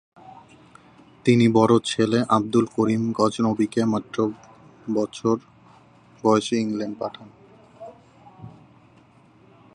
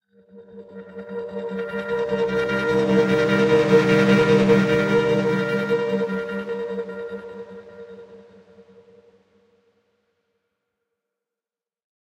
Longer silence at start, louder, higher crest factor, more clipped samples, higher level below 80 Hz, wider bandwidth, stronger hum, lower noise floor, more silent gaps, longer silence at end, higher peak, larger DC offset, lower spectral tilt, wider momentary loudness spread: about the same, 0.25 s vs 0.35 s; about the same, -22 LUFS vs -20 LUFS; about the same, 20 dB vs 18 dB; neither; second, -62 dBFS vs -54 dBFS; about the same, 11 kHz vs 12 kHz; neither; second, -54 dBFS vs under -90 dBFS; neither; second, 1.25 s vs 3.9 s; about the same, -4 dBFS vs -4 dBFS; neither; about the same, -6 dB/octave vs -7 dB/octave; about the same, 22 LU vs 23 LU